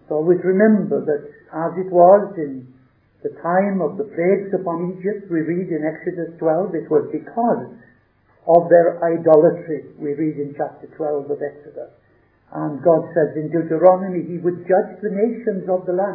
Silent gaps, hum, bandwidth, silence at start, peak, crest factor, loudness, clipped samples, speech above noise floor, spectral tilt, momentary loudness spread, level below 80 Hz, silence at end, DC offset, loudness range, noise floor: none; none; 2.6 kHz; 0.1 s; 0 dBFS; 18 dB; -19 LUFS; under 0.1%; 39 dB; -13.5 dB/octave; 14 LU; -68 dBFS; 0 s; under 0.1%; 5 LU; -57 dBFS